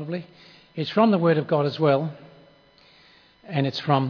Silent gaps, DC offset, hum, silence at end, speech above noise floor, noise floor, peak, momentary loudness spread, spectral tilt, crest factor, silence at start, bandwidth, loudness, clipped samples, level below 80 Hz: none; under 0.1%; none; 0 s; 33 dB; -55 dBFS; -6 dBFS; 14 LU; -8.5 dB/octave; 18 dB; 0 s; 5.4 kHz; -23 LUFS; under 0.1%; -72 dBFS